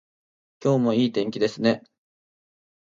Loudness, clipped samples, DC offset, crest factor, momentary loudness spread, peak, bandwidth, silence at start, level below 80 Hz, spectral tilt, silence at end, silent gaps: -24 LUFS; under 0.1%; under 0.1%; 20 dB; 6 LU; -6 dBFS; 7.6 kHz; 0.6 s; -70 dBFS; -6.5 dB/octave; 1.1 s; none